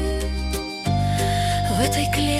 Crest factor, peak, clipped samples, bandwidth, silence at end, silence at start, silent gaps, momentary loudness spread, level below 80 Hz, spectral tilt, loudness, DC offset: 16 dB; -6 dBFS; under 0.1%; 16 kHz; 0 s; 0 s; none; 6 LU; -30 dBFS; -5 dB/octave; -22 LUFS; under 0.1%